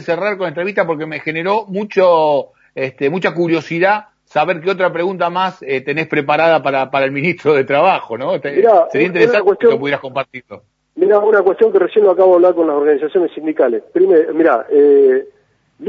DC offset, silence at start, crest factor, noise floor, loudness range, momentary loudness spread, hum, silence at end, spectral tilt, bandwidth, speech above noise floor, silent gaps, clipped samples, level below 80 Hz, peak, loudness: under 0.1%; 0 s; 14 dB; -42 dBFS; 4 LU; 9 LU; none; 0 s; -7 dB/octave; 7.2 kHz; 29 dB; none; under 0.1%; -64 dBFS; 0 dBFS; -14 LUFS